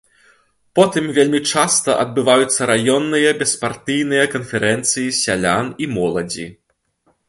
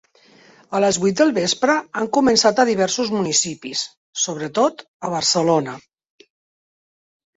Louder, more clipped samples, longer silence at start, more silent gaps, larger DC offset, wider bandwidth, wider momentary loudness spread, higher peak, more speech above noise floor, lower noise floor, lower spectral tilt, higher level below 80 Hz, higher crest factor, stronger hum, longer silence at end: first, -16 LUFS vs -19 LUFS; neither; about the same, 0.75 s vs 0.7 s; second, none vs 3.97-4.13 s, 4.88-5.00 s; neither; first, 12 kHz vs 8.4 kHz; second, 7 LU vs 11 LU; about the same, 0 dBFS vs -2 dBFS; first, 47 dB vs 32 dB; first, -63 dBFS vs -51 dBFS; about the same, -3 dB/octave vs -3 dB/octave; first, -54 dBFS vs -60 dBFS; about the same, 18 dB vs 20 dB; neither; second, 0.75 s vs 1.6 s